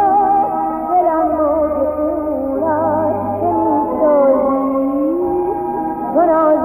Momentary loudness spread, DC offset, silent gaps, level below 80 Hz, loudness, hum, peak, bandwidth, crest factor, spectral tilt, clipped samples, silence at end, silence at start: 7 LU; under 0.1%; none; -44 dBFS; -16 LUFS; none; -4 dBFS; 15 kHz; 12 dB; -10.5 dB/octave; under 0.1%; 0 s; 0 s